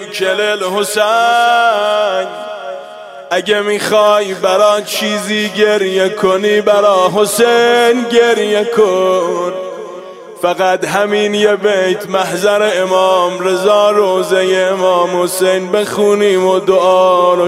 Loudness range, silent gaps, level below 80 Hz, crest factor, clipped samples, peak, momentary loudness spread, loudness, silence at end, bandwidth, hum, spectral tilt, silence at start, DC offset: 3 LU; none; -60 dBFS; 12 dB; under 0.1%; 0 dBFS; 9 LU; -12 LUFS; 0 s; 16 kHz; none; -3.5 dB/octave; 0 s; under 0.1%